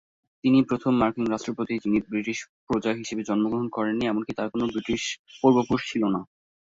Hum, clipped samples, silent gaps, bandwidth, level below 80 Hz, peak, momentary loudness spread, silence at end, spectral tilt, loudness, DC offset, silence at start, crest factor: none; under 0.1%; 2.49-2.67 s, 5.19-5.25 s; 7.8 kHz; -56 dBFS; -6 dBFS; 8 LU; 0.5 s; -5.5 dB/octave; -26 LUFS; under 0.1%; 0.45 s; 20 dB